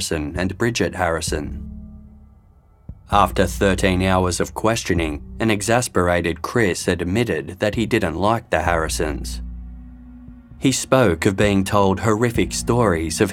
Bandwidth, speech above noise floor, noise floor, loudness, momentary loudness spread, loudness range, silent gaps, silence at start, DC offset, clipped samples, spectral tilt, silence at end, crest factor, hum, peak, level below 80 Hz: 17 kHz; 32 dB; -51 dBFS; -20 LUFS; 10 LU; 4 LU; none; 0 s; under 0.1%; under 0.1%; -5 dB/octave; 0 s; 20 dB; none; -2 dBFS; -36 dBFS